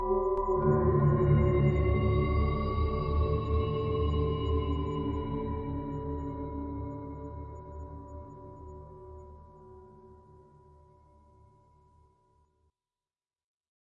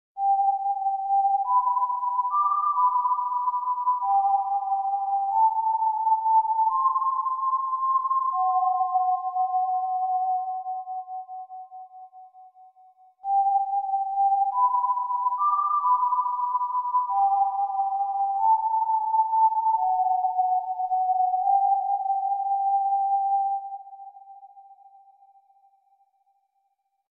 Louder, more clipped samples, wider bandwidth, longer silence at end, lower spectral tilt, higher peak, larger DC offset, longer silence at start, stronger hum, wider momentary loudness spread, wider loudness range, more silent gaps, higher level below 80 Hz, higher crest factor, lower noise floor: second, -30 LUFS vs -24 LUFS; neither; first, 5 kHz vs 1.3 kHz; first, 3.85 s vs 2.35 s; first, -10.5 dB/octave vs -3.5 dB/octave; about the same, -12 dBFS vs -12 dBFS; neither; second, 0 s vs 0.15 s; neither; first, 22 LU vs 5 LU; first, 22 LU vs 6 LU; neither; first, -40 dBFS vs -86 dBFS; first, 18 dB vs 12 dB; first, under -90 dBFS vs -74 dBFS